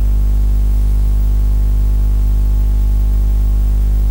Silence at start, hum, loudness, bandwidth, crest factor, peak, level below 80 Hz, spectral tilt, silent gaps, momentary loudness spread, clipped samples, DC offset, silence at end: 0 s; 50 Hz at -10 dBFS; -16 LUFS; 16 kHz; 6 dB; -6 dBFS; -12 dBFS; -8 dB/octave; none; 0 LU; under 0.1%; under 0.1%; 0 s